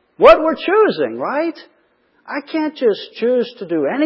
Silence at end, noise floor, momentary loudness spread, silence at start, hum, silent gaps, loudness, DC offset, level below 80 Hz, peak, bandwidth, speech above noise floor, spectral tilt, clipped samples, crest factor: 0 s; -59 dBFS; 13 LU; 0.2 s; none; none; -16 LUFS; under 0.1%; -50 dBFS; 0 dBFS; 8 kHz; 43 dB; -6.5 dB/octave; under 0.1%; 16 dB